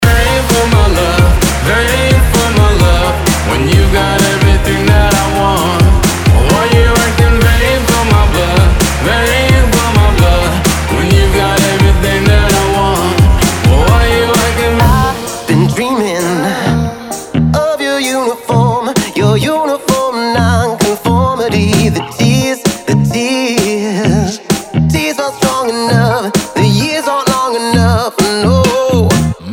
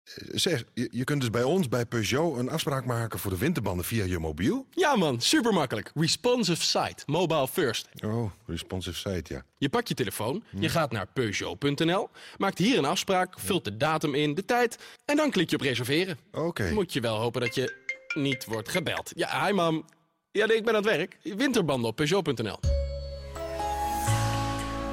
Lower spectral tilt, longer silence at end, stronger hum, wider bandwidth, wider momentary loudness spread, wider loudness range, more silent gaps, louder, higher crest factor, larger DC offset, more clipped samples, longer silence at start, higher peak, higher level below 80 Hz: about the same, -5 dB/octave vs -4.5 dB/octave; about the same, 0 s vs 0 s; neither; first, 19.5 kHz vs 16 kHz; second, 4 LU vs 8 LU; about the same, 3 LU vs 4 LU; neither; first, -11 LUFS vs -28 LUFS; about the same, 10 dB vs 14 dB; neither; neither; about the same, 0 s vs 0.05 s; first, 0 dBFS vs -14 dBFS; first, -16 dBFS vs -44 dBFS